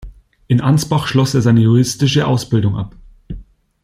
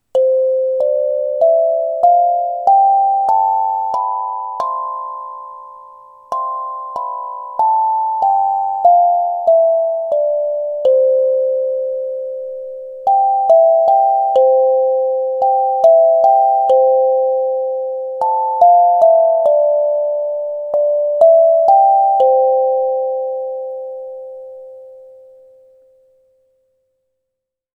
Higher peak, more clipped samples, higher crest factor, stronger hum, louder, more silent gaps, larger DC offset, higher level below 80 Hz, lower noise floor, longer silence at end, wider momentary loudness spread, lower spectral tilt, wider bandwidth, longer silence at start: about the same, -2 dBFS vs 0 dBFS; neither; about the same, 14 dB vs 14 dB; neither; about the same, -15 LUFS vs -14 LUFS; neither; neither; first, -40 dBFS vs -68 dBFS; second, -35 dBFS vs -79 dBFS; second, 0.4 s vs 2.7 s; first, 22 LU vs 14 LU; first, -6 dB/octave vs -4.5 dB/octave; first, 15 kHz vs 4.7 kHz; second, 0 s vs 0.15 s